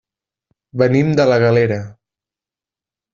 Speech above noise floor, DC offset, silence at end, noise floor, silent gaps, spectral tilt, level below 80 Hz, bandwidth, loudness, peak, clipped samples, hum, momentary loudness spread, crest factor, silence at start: 76 dB; under 0.1%; 1.2 s; -89 dBFS; none; -6.5 dB/octave; -52 dBFS; 7.4 kHz; -15 LUFS; -2 dBFS; under 0.1%; none; 15 LU; 16 dB; 0.75 s